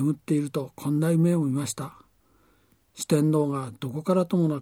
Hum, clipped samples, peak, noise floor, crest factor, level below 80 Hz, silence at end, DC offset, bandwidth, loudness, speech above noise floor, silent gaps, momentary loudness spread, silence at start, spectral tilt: none; under 0.1%; -10 dBFS; -64 dBFS; 16 dB; -68 dBFS; 0 s; under 0.1%; 16 kHz; -26 LUFS; 39 dB; none; 11 LU; 0 s; -7 dB/octave